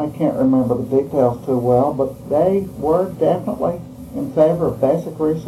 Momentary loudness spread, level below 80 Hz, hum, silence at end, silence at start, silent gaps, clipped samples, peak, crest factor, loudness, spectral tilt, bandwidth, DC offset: 7 LU; -46 dBFS; none; 0 s; 0 s; none; under 0.1%; -2 dBFS; 16 dB; -18 LUFS; -9 dB/octave; 13.5 kHz; under 0.1%